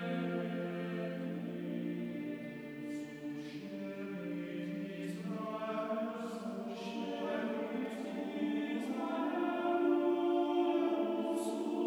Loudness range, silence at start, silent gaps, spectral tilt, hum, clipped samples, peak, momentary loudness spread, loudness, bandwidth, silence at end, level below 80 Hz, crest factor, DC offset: 8 LU; 0 s; none; -6.5 dB/octave; none; under 0.1%; -22 dBFS; 11 LU; -38 LUFS; 19.5 kHz; 0 s; -80 dBFS; 16 dB; under 0.1%